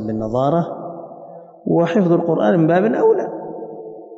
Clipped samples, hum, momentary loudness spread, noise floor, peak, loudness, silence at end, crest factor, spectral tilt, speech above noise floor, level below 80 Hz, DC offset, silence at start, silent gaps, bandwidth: under 0.1%; none; 19 LU; -38 dBFS; -6 dBFS; -17 LUFS; 0 s; 12 dB; -9 dB/octave; 22 dB; -54 dBFS; under 0.1%; 0 s; none; 7.2 kHz